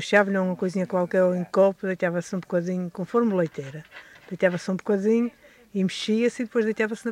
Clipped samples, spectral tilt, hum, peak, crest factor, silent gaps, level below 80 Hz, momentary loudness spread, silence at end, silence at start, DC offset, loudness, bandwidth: under 0.1%; -6.5 dB/octave; none; -6 dBFS; 18 dB; none; -70 dBFS; 11 LU; 0 s; 0 s; under 0.1%; -25 LUFS; 11.5 kHz